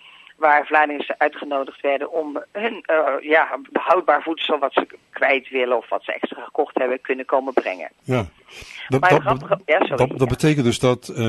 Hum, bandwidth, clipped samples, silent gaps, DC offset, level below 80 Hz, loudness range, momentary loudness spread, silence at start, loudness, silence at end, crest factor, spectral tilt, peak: none; 12.5 kHz; under 0.1%; none; under 0.1%; -50 dBFS; 3 LU; 9 LU; 0.4 s; -20 LUFS; 0 s; 18 dB; -5.5 dB/octave; -2 dBFS